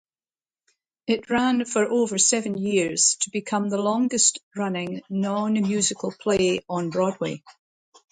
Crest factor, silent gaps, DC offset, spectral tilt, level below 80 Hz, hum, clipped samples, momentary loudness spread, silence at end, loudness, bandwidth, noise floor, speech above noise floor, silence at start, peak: 20 dB; 4.43-4.51 s; under 0.1%; -3 dB/octave; -62 dBFS; none; under 0.1%; 10 LU; 0.6 s; -23 LUFS; 9.6 kHz; under -90 dBFS; over 67 dB; 1.1 s; -4 dBFS